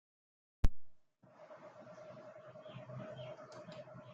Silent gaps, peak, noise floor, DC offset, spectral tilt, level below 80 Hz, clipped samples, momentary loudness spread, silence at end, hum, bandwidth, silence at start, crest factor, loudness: none; -16 dBFS; -62 dBFS; under 0.1%; -6.5 dB/octave; -46 dBFS; under 0.1%; 15 LU; 0 s; none; 7.4 kHz; 0.65 s; 24 dB; -48 LUFS